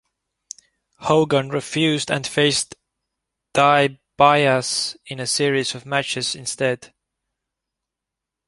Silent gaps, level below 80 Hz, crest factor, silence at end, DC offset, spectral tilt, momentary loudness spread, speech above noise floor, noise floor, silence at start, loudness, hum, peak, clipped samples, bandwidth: none; -60 dBFS; 20 dB; 1.6 s; under 0.1%; -3.5 dB/octave; 14 LU; 65 dB; -85 dBFS; 1 s; -19 LUFS; none; -2 dBFS; under 0.1%; 11.5 kHz